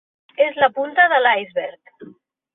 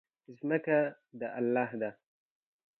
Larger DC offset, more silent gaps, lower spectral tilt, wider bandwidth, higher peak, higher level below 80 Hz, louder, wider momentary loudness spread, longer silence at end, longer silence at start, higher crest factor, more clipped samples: neither; neither; second, -7 dB/octave vs -10 dB/octave; about the same, 4 kHz vs 4.2 kHz; first, -2 dBFS vs -16 dBFS; first, -70 dBFS vs -86 dBFS; first, -17 LUFS vs -33 LUFS; first, 16 LU vs 11 LU; second, 0.45 s vs 0.85 s; about the same, 0.4 s vs 0.3 s; about the same, 18 dB vs 18 dB; neither